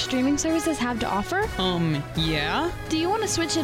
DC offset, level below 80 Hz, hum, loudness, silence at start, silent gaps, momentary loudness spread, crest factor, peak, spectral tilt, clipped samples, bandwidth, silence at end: under 0.1%; -40 dBFS; none; -24 LUFS; 0 s; none; 3 LU; 12 dB; -12 dBFS; -4 dB/octave; under 0.1%; 16.5 kHz; 0 s